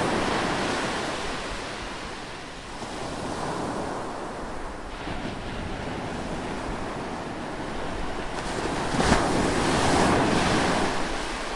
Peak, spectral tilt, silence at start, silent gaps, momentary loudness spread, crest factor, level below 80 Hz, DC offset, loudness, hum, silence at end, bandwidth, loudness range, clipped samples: -6 dBFS; -4.5 dB/octave; 0 s; none; 13 LU; 20 dB; -40 dBFS; under 0.1%; -28 LUFS; none; 0 s; 11.5 kHz; 9 LU; under 0.1%